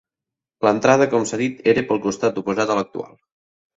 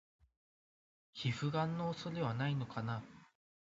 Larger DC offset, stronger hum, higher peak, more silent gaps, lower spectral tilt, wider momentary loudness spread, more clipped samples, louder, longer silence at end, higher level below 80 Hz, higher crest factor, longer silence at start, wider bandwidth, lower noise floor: neither; neither; first, 0 dBFS vs -24 dBFS; neither; about the same, -5 dB/octave vs -5.5 dB/octave; about the same, 10 LU vs 8 LU; neither; first, -19 LUFS vs -39 LUFS; first, 0.7 s vs 0.4 s; first, -60 dBFS vs -72 dBFS; about the same, 20 dB vs 18 dB; second, 0.6 s vs 1.15 s; about the same, 8 kHz vs 7.6 kHz; about the same, -87 dBFS vs under -90 dBFS